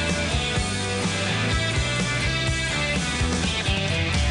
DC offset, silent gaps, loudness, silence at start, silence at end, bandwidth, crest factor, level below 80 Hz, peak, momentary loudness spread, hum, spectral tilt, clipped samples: under 0.1%; none; -23 LUFS; 0 s; 0 s; 10.5 kHz; 12 dB; -34 dBFS; -12 dBFS; 1 LU; none; -4 dB/octave; under 0.1%